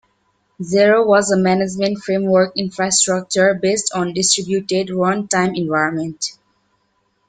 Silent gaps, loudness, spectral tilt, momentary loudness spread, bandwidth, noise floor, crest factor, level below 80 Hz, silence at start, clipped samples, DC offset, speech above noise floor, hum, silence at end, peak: none; -17 LUFS; -3.5 dB/octave; 7 LU; 9.6 kHz; -65 dBFS; 16 dB; -58 dBFS; 0.6 s; under 0.1%; under 0.1%; 48 dB; none; 0.95 s; 0 dBFS